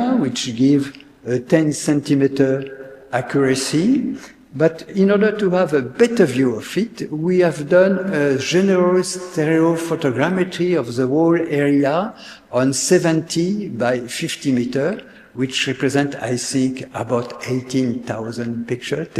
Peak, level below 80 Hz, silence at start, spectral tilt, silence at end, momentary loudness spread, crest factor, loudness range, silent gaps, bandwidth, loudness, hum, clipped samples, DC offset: 0 dBFS; -58 dBFS; 0 s; -5.5 dB/octave; 0 s; 10 LU; 18 dB; 4 LU; none; 14 kHz; -18 LUFS; none; under 0.1%; under 0.1%